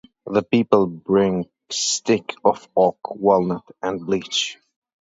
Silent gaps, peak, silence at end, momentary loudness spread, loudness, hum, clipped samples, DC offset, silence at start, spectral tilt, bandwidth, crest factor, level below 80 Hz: none; -2 dBFS; 0.5 s; 9 LU; -21 LUFS; none; under 0.1%; under 0.1%; 0.25 s; -4 dB/octave; 8 kHz; 20 dB; -58 dBFS